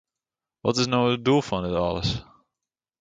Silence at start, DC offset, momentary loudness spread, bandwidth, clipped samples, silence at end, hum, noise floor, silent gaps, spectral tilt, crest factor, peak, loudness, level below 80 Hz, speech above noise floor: 0.65 s; under 0.1%; 7 LU; 9.2 kHz; under 0.1%; 0.8 s; none; -90 dBFS; none; -5.5 dB/octave; 20 dB; -6 dBFS; -24 LUFS; -48 dBFS; 66 dB